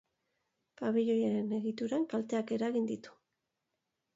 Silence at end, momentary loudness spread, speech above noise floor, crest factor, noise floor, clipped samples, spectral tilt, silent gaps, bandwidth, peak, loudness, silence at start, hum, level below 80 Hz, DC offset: 1.05 s; 7 LU; 53 dB; 16 dB; -86 dBFS; under 0.1%; -7 dB/octave; none; 7.8 kHz; -20 dBFS; -34 LUFS; 0.8 s; none; -82 dBFS; under 0.1%